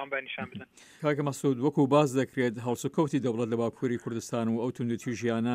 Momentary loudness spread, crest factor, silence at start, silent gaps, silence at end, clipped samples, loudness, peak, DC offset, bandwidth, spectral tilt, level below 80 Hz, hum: 10 LU; 18 dB; 0 s; none; 0 s; under 0.1%; -29 LUFS; -10 dBFS; under 0.1%; 15.5 kHz; -6.5 dB/octave; -72 dBFS; none